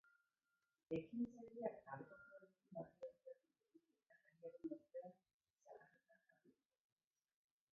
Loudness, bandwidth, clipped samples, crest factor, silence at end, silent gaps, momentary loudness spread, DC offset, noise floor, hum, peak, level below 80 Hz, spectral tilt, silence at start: -53 LUFS; 6.2 kHz; under 0.1%; 24 dB; 1.2 s; 5.33-5.40 s; 17 LU; under 0.1%; under -90 dBFS; none; -32 dBFS; -88 dBFS; -7.5 dB/octave; 0.05 s